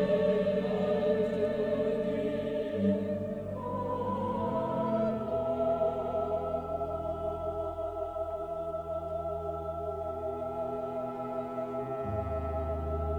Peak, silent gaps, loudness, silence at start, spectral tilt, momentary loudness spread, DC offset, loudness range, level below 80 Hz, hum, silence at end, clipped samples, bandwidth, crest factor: -16 dBFS; none; -33 LUFS; 0 s; -8.5 dB/octave; 7 LU; under 0.1%; 5 LU; -48 dBFS; none; 0 s; under 0.1%; 18.5 kHz; 16 dB